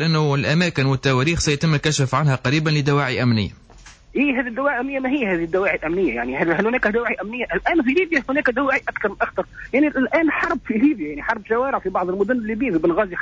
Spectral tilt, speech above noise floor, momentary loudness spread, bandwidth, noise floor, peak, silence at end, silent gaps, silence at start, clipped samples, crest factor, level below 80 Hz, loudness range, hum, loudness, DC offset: -5.5 dB/octave; 25 dB; 5 LU; 8 kHz; -45 dBFS; -6 dBFS; 0 s; none; 0 s; under 0.1%; 14 dB; -44 dBFS; 2 LU; none; -20 LUFS; under 0.1%